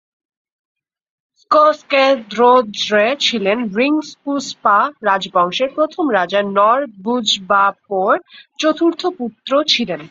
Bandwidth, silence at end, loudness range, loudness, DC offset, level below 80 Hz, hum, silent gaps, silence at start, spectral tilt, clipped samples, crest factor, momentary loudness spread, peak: 7.8 kHz; 0.05 s; 2 LU; -15 LUFS; under 0.1%; -64 dBFS; none; none; 1.5 s; -3.5 dB/octave; under 0.1%; 16 dB; 7 LU; 0 dBFS